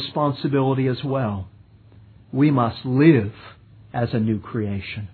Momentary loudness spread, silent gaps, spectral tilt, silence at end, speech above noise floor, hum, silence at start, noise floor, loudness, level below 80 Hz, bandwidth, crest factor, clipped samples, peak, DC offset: 14 LU; none; -11 dB/octave; 0.05 s; 28 dB; none; 0 s; -48 dBFS; -21 LUFS; -54 dBFS; 4.6 kHz; 18 dB; under 0.1%; -2 dBFS; under 0.1%